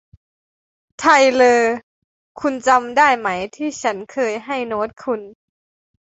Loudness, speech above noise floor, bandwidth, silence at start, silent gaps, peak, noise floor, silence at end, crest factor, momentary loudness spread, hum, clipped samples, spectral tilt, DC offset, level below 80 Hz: -17 LUFS; over 73 dB; 8.2 kHz; 1 s; 1.83-2.35 s; -2 dBFS; under -90 dBFS; 0.85 s; 18 dB; 13 LU; none; under 0.1%; -3 dB/octave; under 0.1%; -60 dBFS